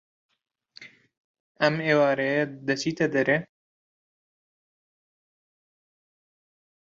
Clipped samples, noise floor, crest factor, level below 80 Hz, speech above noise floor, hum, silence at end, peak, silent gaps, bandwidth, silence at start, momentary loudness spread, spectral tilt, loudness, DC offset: under 0.1%; -51 dBFS; 24 dB; -72 dBFS; 27 dB; none; 3.4 s; -6 dBFS; 1.18-1.34 s, 1.40-1.55 s; 7.8 kHz; 0.8 s; 6 LU; -5.5 dB/octave; -24 LUFS; under 0.1%